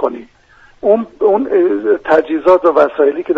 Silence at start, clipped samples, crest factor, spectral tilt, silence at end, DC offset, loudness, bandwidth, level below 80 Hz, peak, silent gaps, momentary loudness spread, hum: 0 s; under 0.1%; 14 dB; -7 dB/octave; 0 s; under 0.1%; -13 LUFS; 6.4 kHz; -52 dBFS; 0 dBFS; none; 7 LU; none